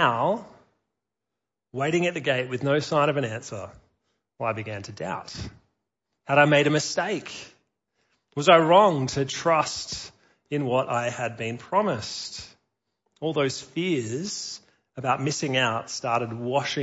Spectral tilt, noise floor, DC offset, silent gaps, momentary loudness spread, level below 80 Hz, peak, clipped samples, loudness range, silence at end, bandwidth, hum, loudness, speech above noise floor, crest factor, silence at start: -4.5 dB/octave; -87 dBFS; under 0.1%; none; 19 LU; -60 dBFS; -4 dBFS; under 0.1%; 7 LU; 0 s; 8 kHz; none; -25 LUFS; 62 dB; 22 dB; 0 s